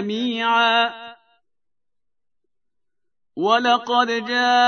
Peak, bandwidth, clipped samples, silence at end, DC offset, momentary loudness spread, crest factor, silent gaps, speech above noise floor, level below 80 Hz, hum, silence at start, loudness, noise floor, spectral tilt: -4 dBFS; 6.6 kHz; under 0.1%; 0 s; under 0.1%; 9 LU; 18 dB; none; 67 dB; -82 dBFS; none; 0 s; -19 LUFS; -86 dBFS; -3 dB/octave